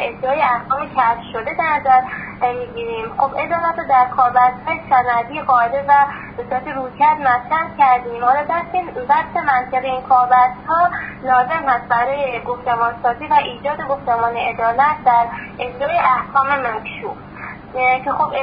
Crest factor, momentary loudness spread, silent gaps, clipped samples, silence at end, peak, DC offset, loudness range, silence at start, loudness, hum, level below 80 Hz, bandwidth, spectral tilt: 16 dB; 10 LU; none; under 0.1%; 0 s; -2 dBFS; under 0.1%; 2 LU; 0 s; -17 LUFS; none; -48 dBFS; 5.2 kHz; -9.5 dB/octave